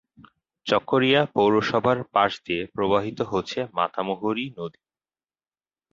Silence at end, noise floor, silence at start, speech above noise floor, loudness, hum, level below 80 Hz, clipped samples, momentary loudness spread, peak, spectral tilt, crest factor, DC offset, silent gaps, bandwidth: 1.25 s; under -90 dBFS; 0.65 s; over 67 dB; -23 LUFS; none; -60 dBFS; under 0.1%; 9 LU; -4 dBFS; -6 dB/octave; 20 dB; under 0.1%; none; 7.6 kHz